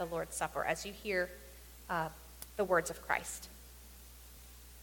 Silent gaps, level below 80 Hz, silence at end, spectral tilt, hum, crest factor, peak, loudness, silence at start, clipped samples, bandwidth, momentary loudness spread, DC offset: none; -56 dBFS; 0 s; -3.5 dB/octave; none; 24 dB; -16 dBFS; -37 LUFS; 0 s; under 0.1%; 17.5 kHz; 21 LU; under 0.1%